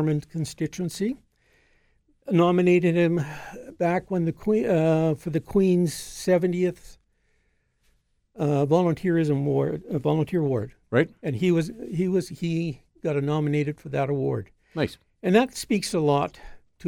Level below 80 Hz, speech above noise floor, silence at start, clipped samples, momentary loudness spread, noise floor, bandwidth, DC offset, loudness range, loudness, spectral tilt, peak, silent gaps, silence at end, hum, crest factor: -54 dBFS; 45 dB; 0 s; under 0.1%; 9 LU; -68 dBFS; 16 kHz; under 0.1%; 3 LU; -25 LUFS; -7 dB/octave; -6 dBFS; none; 0 s; none; 18 dB